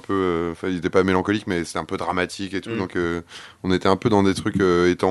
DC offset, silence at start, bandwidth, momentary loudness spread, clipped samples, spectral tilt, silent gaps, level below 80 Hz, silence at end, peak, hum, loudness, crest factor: under 0.1%; 0.1 s; 12 kHz; 9 LU; under 0.1%; -6 dB/octave; none; -50 dBFS; 0 s; -2 dBFS; none; -22 LUFS; 20 dB